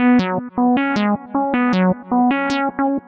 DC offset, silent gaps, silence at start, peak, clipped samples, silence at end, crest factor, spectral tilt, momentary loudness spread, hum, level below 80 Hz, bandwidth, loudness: under 0.1%; none; 0 s; -6 dBFS; under 0.1%; 0.1 s; 12 dB; -7 dB/octave; 4 LU; none; -52 dBFS; 7.6 kHz; -18 LUFS